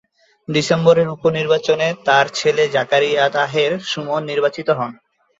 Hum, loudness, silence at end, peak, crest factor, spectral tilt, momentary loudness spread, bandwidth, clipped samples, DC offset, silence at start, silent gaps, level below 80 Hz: none; -17 LUFS; 0.45 s; -2 dBFS; 16 dB; -4.5 dB/octave; 7 LU; 8 kHz; under 0.1%; under 0.1%; 0.5 s; none; -60 dBFS